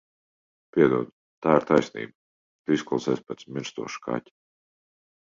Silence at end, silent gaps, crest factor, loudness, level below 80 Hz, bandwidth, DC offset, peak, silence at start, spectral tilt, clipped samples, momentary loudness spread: 1.1 s; 1.13-1.42 s, 2.15-2.65 s; 22 dB; -26 LUFS; -66 dBFS; 7.6 kHz; under 0.1%; -4 dBFS; 0.75 s; -6 dB/octave; under 0.1%; 15 LU